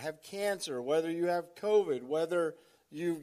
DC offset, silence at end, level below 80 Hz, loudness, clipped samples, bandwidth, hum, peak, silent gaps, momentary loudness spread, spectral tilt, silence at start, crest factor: under 0.1%; 0 s; -84 dBFS; -33 LUFS; under 0.1%; 15 kHz; none; -18 dBFS; none; 8 LU; -5 dB/octave; 0 s; 16 dB